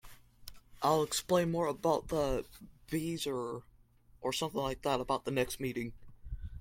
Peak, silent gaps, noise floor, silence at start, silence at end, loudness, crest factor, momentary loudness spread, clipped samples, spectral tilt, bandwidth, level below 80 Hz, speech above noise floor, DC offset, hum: -16 dBFS; none; -63 dBFS; 0.05 s; 0 s; -34 LUFS; 20 dB; 18 LU; under 0.1%; -4.5 dB/octave; 16.5 kHz; -52 dBFS; 29 dB; under 0.1%; none